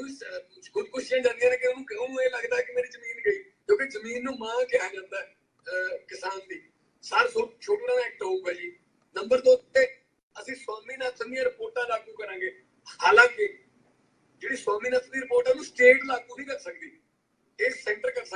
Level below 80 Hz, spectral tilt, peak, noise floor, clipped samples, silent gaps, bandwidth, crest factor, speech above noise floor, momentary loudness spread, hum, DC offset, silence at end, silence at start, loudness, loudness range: -70 dBFS; -2 dB/octave; -4 dBFS; -72 dBFS; under 0.1%; 10.23-10.30 s; 10 kHz; 24 dB; 44 dB; 18 LU; none; under 0.1%; 0 s; 0 s; -26 LUFS; 5 LU